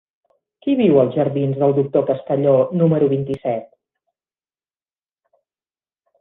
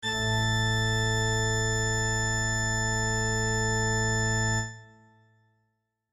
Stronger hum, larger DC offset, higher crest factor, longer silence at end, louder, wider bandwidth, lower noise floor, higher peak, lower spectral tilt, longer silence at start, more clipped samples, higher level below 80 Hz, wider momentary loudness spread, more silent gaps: neither; neither; first, 18 dB vs 12 dB; first, 2.55 s vs 1.25 s; first, -18 LUFS vs -26 LUFS; second, 4 kHz vs 13 kHz; first, under -90 dBFS vs -78 dBFS; first, -2 dBFS vs -16 dBFS; first, -11 dB/octave vs -3.5 dB/octave; first, 0.65 s vs 0 s; neither; second, -60 dBFS vs -40 dBFS; first, 9 LU vs 1 LU; neither